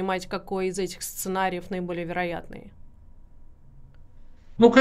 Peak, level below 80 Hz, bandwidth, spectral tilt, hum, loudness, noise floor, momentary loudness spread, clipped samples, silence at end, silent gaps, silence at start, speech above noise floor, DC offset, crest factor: -4 dBFS; -48 dBFS; 16 kHz; -5 dB/octave; none; -27 LUFS; -47 dBFS; 16 LU; under 0.1%; 0 s; none; 0 s; 18 dB; under 0.1%; 22 dB